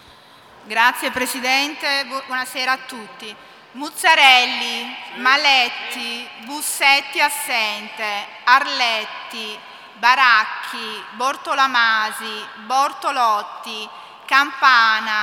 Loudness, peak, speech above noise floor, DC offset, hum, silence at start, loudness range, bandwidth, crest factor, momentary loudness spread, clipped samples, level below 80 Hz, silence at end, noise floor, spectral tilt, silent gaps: -17 LUFS; 0 dBFS; 27 dB; under 0.1%; none; 0.65 s; 4 LU; 18 kHz; 20 dB; 17 LU; under 0.1%; -70 dBFS; 0 s; -46 dBFS; 0.5 dB/octave; none